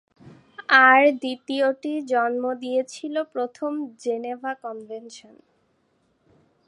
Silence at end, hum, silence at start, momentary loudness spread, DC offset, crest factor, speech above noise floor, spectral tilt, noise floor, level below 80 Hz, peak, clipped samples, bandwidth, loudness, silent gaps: 1.5 s; none; 0.25 s; 21 LU; under 0.1%; 22 dB; 45 dB; -3 dB/octave; -67 dBFS; -78 dBFS; -2 dBFS; under 0.1%; 11.5 kHz; -22 LUFS; none